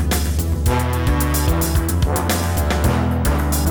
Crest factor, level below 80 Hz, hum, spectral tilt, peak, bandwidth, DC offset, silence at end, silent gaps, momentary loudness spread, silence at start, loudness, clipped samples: 12 dB; -22 dBFS; none; -5 dB/octave; -6 dBFS; over 20 kHz; under 0.1%; 0 s; none; 1 LU; 0 s; -19 LUFS; under 0.1%